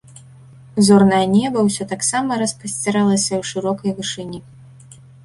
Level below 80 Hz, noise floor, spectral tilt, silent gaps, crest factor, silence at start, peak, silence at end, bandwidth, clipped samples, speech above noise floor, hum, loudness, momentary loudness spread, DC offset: -54 dBFS; -43 dBFS; -4.5 dB/octave; none; 16 dB; 0.75 s; -2 dBFS; 0.85 s; 11.5 kHz; under 0.1%; 26 dB; none; -17 LUFS; 13 LU; under 0.1%